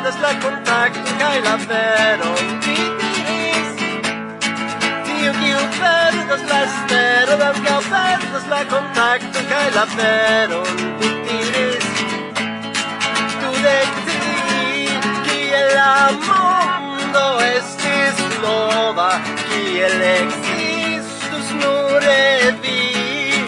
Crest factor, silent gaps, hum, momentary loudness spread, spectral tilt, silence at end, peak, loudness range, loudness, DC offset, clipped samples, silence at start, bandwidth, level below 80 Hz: 14 dB; none; none; 7 LU; -3 dB/octave; 0 s; -2 dBFS; 3 LU; -16 LUFS; under 0.1%; under 0.1%; 0 s; 11 kHz; -64 dBFS